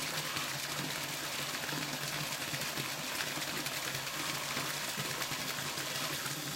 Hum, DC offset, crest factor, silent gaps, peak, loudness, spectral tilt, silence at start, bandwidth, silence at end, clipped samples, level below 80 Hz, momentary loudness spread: none; under 0.1%; 20 dB; none; -18 dBFS; -35 LUFS; -1.5 dB/octave; 0 s; 17 kHz; 0 s; under 0.1%; -68 dBFS; 1 LU